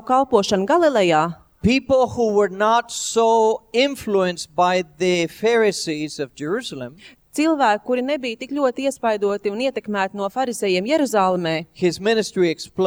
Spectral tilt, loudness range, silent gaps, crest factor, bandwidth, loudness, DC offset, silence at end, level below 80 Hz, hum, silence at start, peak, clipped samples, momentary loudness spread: -4.5 dB/octave; 4 LU; none; 18 dB; over 20 kHz; -20 LUFS; under 0.1%; 0 s; -52 dBFS; none; 0.05 s; -2 dBFS; under 0.1%; 8 LU